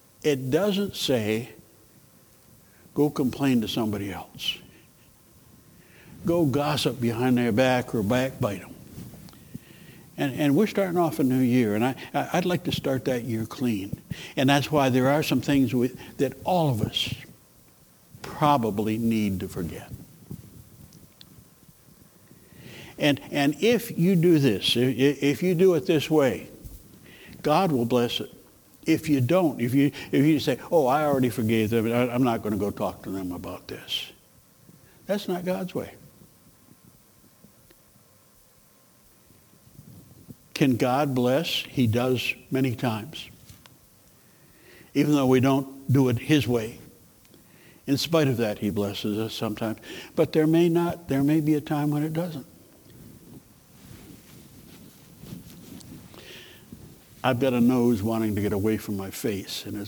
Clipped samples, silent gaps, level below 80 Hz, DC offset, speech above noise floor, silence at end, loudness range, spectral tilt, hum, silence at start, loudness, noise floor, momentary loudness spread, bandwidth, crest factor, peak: under 0.1%; none; -58 dBFS; under 0.1%; 34 dB; 0 s; 10 LU; -6 dB/octave; none; 0.25 s; -25 LUFS; -58 dBFS; 21 LU; over 20 kHz; 20 dB; -6 dBFS